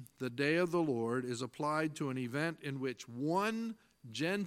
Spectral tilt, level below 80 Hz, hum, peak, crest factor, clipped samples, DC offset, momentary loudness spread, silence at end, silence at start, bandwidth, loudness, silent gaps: -5.5 dB/octave; -80 dBFS; none; -18 dBFS; 18 dB; under 0.1%; under 0.1%; 9 LU; 0 s; 0 s; 16 kHz; -36 LUFS; none